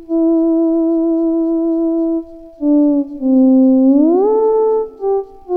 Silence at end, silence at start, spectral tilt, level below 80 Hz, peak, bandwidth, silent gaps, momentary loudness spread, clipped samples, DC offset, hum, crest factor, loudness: 0 s; 0 s; -11 dB/octave; -46 dBFS; -2 dBFS; 1.9 kHz; none; 9 LU; under 0.1%; under 0.1%; none; 10 dB; -14 LUFS